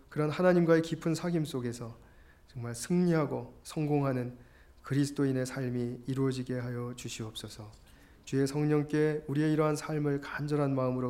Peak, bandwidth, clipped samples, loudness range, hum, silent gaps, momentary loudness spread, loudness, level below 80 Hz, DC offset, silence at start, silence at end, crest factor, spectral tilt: -12 dBFS; 16 kHz; under 0.1%; 4 LU; none; none; 14 LU; -31 LUFS; -60 dBFS; under 0.1%; 0.1 s; 0 s; 18 dB; -6.5 dB/octave